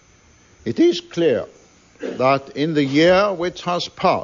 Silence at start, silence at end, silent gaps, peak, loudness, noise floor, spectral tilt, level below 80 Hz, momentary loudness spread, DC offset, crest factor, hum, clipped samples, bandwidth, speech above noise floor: 0.65 s; 0 s; none; -4 dBFS; -19 LUFS; -52 dBFS; -5.5 dB/octave; -56 dBFS; 15 LU; under 0.1%; 16 dB; none; under 0.1%; 7.6 kHz; 34 dB